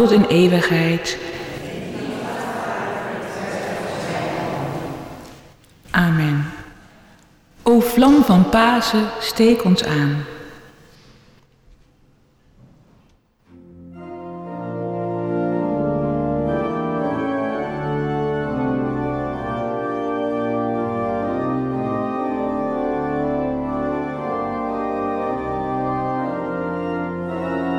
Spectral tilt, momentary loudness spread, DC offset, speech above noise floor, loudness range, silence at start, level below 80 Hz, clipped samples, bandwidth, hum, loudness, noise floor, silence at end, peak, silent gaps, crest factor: -6.5 dB/octave; 15 LU; under 0.1%; 41 dB; 10 LU; 0 s; -46 dBFS; under 0.1%; 20 kHz; none; -20 LUFS; -56 dBFS; 0 s; -4 dBFS; none; 18 dB